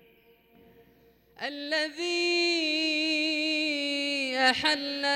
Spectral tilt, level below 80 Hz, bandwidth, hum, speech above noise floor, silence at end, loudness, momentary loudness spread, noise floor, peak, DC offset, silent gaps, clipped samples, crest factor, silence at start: -1.5 dB/octave; -72 dBFS; 16 kHz; none; 33 dB; 0 s; -26 LUFS; 6 LU; -61 dBFS; -12 dBFS; under 0.1%; none; under 0.1%; 18 dB; 1.4 s